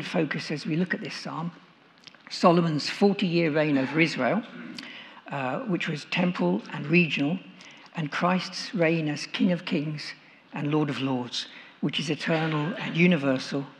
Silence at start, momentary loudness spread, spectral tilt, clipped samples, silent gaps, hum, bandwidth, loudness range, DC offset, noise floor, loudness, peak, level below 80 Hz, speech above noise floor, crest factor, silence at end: 0 s; 16 LU; -6 dB/octave; under 0.1%; none; none; 10 kHz; 4 LU; under 0.1%; -53 dBFS; -26 LUFS; -4 dBFS; -84 dBFS; 27 dB; 22 dB; 0.05 s